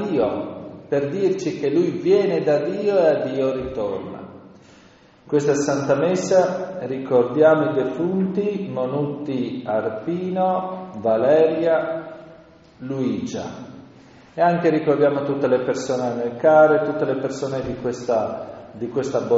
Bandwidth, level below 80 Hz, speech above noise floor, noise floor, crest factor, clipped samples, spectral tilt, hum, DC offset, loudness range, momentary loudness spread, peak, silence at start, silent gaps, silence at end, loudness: 8 kHz; -58 dBFS; 30 dB; -50 dBFS; 18 dB; under 0.1%; -6 dB/octave; none; under 0.1%; 4 LU; 14 LU; -2 dBFS; 0 s; none; 0 s; -21 LUFS